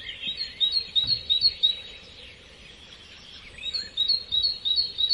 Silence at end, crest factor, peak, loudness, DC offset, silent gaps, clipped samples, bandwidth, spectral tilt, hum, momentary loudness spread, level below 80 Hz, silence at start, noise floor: 0 s; 18 dB; -10 dBFS; -23 LUFS; under 0.1%; none; under 0.1%; 11.5 kHz; -1.5 dB/octave; none; 24 LU; -56 dBFS; 0 s; -48 dBFS